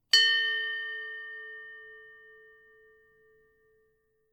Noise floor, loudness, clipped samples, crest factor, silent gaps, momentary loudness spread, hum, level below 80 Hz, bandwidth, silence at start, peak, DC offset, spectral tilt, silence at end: -72 dBFS; -27 LUFS; under 0.1%; 26 dB; none; 27 LU; none; -80 dBFS; 19.5 kHz; 0.15 s; -8 dBFS; under 0.1%; 4 dB/octave; 2.2 s